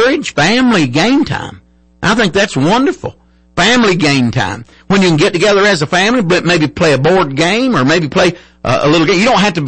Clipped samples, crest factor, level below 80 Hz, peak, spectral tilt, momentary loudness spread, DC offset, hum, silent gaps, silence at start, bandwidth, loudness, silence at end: under 0.1%; 10 dB; -40 dBFS; -2 dBFS; -5 dB/octave; 8 LU; under 0.1%; none; none; 0 s; 8.8 kHz; -11 LUFS; 0 s